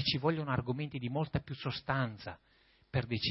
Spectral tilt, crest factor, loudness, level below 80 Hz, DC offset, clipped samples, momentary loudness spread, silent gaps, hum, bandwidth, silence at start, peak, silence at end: -4.5 dB/octave; 20 dB; -36 LUFS; -58 dBFS; under 0.1%; under 0.1%; 9 LU; none; none; 5.8 kHz; 0 s; -16 dBFS; 0 s